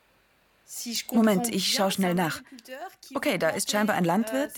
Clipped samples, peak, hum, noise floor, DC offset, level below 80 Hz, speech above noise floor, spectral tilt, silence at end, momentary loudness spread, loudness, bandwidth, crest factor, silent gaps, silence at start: under 0.1%; -10 dBFS; none; -64 dBFS; under 0.1%; -68 dBFS; 38 dB; -4 dB/octave; 0 s; 17 LU; -26 LUFS; 19 kHz; 16 dB; none; 0.7 s